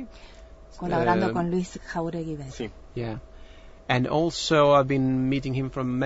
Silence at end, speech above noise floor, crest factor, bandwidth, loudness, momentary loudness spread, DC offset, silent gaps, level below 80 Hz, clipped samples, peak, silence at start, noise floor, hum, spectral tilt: 0 s; 22 dB; 18 dB; 8 kHz; -25 LUFS; 16 LU; under 0.1%; none; -46 dBFS; under 0.1%; -8 dBFS; 0 s; -46 dBFS; none; -6 dB/octave